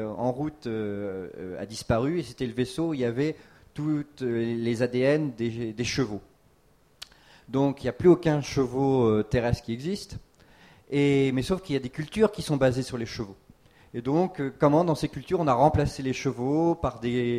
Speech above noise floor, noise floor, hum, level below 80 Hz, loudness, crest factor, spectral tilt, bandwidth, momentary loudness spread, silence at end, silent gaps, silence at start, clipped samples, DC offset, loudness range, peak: 36 dB; -62 dBFS; none; -48 dBFS; -27 LUFS; 20 dB; -6.5 dB/octave; 14.5 kHz; 13 LU; 0 s; none; 0 s; under 0.1%; under 0.1%; 4 LU; -8 dBFS